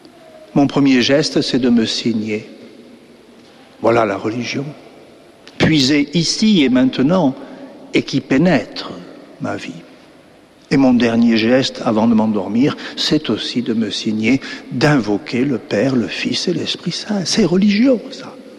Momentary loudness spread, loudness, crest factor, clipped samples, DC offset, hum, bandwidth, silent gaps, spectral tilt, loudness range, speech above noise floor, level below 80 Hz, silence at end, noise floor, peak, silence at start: 13 LU; -16 LUFS; 14 dB; under 0.1%; under 0.1%; none; 11.5 kHz; none; -5 dB/octave; 5 LU; 30 dB; -48 dBFS; 0 s; -46 dBFS; -2 dBFS; 0.35 s